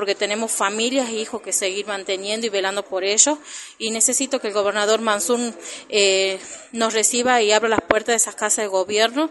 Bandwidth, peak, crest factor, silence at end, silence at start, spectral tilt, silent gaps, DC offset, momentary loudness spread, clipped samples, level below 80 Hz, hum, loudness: 12 kHz; 0 dBFS; 20 dB; 0 s; 0 s; -1 dB/octave; none; under 0.1%; 10 LU; under 0.1%; -62 dBFS; none; -19 LUFS